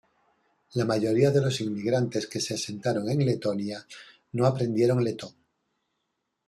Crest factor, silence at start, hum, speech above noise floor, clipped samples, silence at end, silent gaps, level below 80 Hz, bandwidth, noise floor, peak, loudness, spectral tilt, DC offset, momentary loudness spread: 18 dB; 0.75 s; none; 54 dB; under 0.1%; 1.15 s; none; -66 dBFS; 13 kHz; -80 dBFS; -10 dBFS; -27 LUFS; -6 dB/octave; under 0.1%; 14 LU